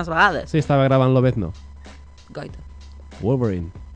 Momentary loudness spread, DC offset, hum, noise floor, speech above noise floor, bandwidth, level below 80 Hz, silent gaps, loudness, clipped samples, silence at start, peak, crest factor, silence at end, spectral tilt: 21 LU; under 0.1%; none; -41 dBFS; 22 dB; 8.6 kHz; -40 dBFS; none; -19 LUFS; under 0.1%; 0 s; -4 dBFS; 18 dB; 0 s; -7.5 dB/octave